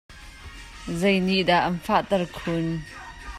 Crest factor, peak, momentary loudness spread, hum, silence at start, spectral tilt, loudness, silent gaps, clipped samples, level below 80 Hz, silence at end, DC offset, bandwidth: 18 dB; -8 dBFS; 21 LU; none; 0.1 s; -5.5 dB/octave; -24 LUFS; none; under 0.1%; -46 dBFS; 0 s; under 0.1%; 14 kHz